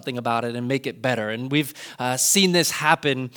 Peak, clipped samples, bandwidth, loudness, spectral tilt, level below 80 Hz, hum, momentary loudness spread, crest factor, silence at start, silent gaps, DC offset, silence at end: -2 dBFS; under 0.1%; over 20 kHz; -21 LUFS; -3 dB/octave; -70 dBFS; none; 9 LU; 22 dB; 0.05 s; none; under 0.1%; 0.05 s